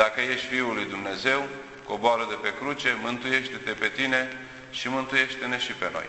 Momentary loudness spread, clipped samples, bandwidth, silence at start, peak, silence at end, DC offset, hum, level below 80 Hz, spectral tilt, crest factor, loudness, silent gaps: 9 LU; under 0.1%; 8.4 kHz; 0 s; -6 dBFS; 0 s; under 0.1%; none; -62 dBFS; -3.5 dB/octave; 22 dB; -26 LUFS; none